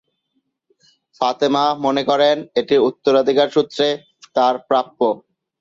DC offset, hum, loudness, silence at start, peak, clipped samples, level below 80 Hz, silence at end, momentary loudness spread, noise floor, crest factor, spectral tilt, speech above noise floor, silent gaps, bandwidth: under 0.1%; none; -18 LUFS; 1.2 s; -2 dBFS; under 0.1%; -66 dBFS; 0.45 s; 6 LU; -71 dBFS; 16 dB; -5 dB/octave; 54 dB; none; 7.6 kHz